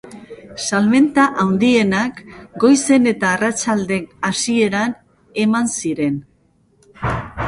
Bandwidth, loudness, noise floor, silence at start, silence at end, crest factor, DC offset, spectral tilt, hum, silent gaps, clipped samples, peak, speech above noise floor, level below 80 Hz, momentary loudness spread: 11.5 kHz; -17 LUFS; -57 dBFS; 0.05 s; 0 s; 16 dB; under 0.1%; -4.5 dB/octave; none; none; under 0.1%; -2 dBFS; 41 dB; -46 dBFS; 15 LU